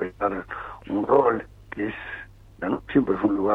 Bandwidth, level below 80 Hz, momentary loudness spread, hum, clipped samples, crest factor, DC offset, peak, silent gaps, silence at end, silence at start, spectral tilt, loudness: 4.4 kHz; -50 dBFS; 16 LU; none; under 0.1%; 18 dB; under 0.1%; -6 dBFS; none; 0 s; 0 s; -8.5 dB/octave; -25 LUFS